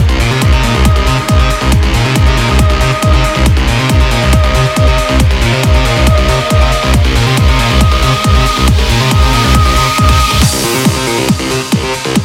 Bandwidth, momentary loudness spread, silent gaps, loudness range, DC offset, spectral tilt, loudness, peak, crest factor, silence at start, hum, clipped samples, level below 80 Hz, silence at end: 16.5 kHz; 2 LU; none; 1 LU; under 0.1%; -5 dB/octave; -10 LUFS; 0 dBFS; 8 dB; 0 s; none; under 0.1%; -12 dBFS; 0 s